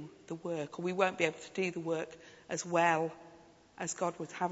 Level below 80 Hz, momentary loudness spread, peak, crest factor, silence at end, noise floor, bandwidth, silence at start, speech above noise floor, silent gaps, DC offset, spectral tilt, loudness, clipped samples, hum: -76 dBFS; 14 LU; -12 dBFS; 22 dB; 0 s; -59 dBFS; 8.2 kHz; 0 s; 24 dB; none; under 0.1%; -4 dB/octave; -35 LUFS; under 0.1%; none